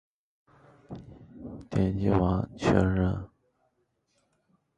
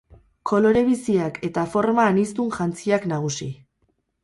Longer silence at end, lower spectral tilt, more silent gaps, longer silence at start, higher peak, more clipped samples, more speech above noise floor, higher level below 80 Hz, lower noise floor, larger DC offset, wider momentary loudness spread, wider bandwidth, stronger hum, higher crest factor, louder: first, 1.5 s vs 0.7 s; first, -8 dB/octave vs -6 dB/octave; neither; first, 0.9 s vs 0.45 s; about the same, -8 dBFS vs -6 dBFS; neither; about the same, 49 dB vs 48 dB; first, -44 dBFS vs -56 dBFS; first, -74 dBFS vs -69 dBFS; neither; first, 21 LU vs 11 LU; second, 9 kHz vs 11.5 kHz; neither; first, 22 dB vs 16 dB; second, -27 LUFS vs -22 LUFS